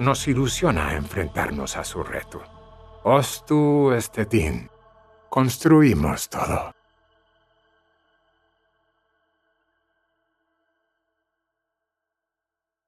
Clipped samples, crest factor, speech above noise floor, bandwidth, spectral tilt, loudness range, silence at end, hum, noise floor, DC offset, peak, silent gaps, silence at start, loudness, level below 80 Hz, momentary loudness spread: under 0.1%; 22 dB; 66 dB; 14.5 kHz; -5.5 dB/octave; 8 LU; 6.15 s; none; -87 dBFS; under 0.1%; -2 dBFS; none; 0 s; -22 LUFS; -44 dBFS; 14 LU